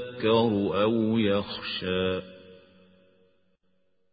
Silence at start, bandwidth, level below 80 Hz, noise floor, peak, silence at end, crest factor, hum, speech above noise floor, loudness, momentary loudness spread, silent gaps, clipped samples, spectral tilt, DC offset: 0 s; 5 kHz; -56 dBFS; -73 dBFS; -10 dBFS; 1.55 s; 18 dB; none; 48 dB; -26 LUFS; 9 LU; none; under 0.1%; -10.5 dB/octave; under 0.1%